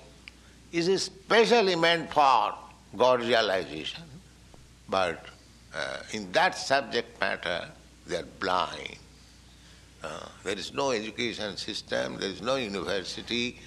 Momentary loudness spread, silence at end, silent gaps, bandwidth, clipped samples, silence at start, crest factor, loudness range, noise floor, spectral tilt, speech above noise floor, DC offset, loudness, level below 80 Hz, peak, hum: 17 LU; 0 s; none; 13 kHz; under 0.1%; 0 s; 20 dB; 9 LU; -53 dBFS; -3.5 dB/octave; 25 dB; under 0.1%; -28 LUFS; -58 dBFS; -10 dBFS; none